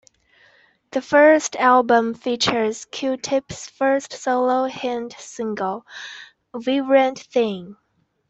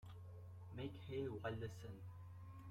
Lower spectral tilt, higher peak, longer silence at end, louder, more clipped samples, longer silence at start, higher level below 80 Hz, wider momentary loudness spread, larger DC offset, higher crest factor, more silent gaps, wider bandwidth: second, -3.5 dB/octave vs -7 dB/octave; first, -4 dBFS vs -32 dBFS; first, 0.55 s vs 0 s; first, -20 LUFS vs -51 LUFS; neither; first, 0.95 s vs 0 s; first, -62 dBFS vs -70 dBFS; first, 19 LU vs 11 LU; neither; about the same, 18 dB vs 18 dB; neither; second, 8.2 kHz vs 15.5 kHz